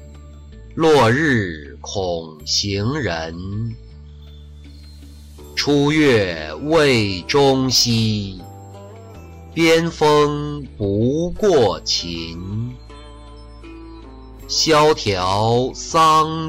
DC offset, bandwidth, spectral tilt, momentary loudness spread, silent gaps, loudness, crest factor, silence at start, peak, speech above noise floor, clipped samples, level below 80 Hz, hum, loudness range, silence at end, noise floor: under 0.1%; 16 kHz; -4.5 dB/octave; 24 LU; none; -17 LUFS; 14 dB; 0 s; -6 dBFS; 21 dB; under 0.1%; -40 dBFS; none; 7 LU; 0 s; -39 dBFS